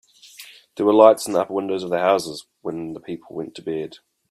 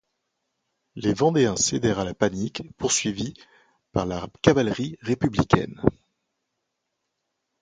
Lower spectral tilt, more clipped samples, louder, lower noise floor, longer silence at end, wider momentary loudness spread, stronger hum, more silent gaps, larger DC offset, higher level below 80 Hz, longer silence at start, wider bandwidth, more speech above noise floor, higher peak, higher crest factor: about the same, -5 dB/octave vs -4.5 dB/octave; neither; first, -20 LUFS vs -24 LUFS; second, -45 dBFS vs -79 dBFS; second, 0.35 s vs 1.7 s; first, 23 LU vs 10 LU; neither; neither; neither; second, -68 dBFS vs -48 dBFS; second, 0.4 s vs 0.95 s; first, 15 kHz vs 9.6 kHz; second, 25 dB vs 56 dB; about the same, 0 dBFS vs 0 dBFS; second, 20 dB vs 26 dB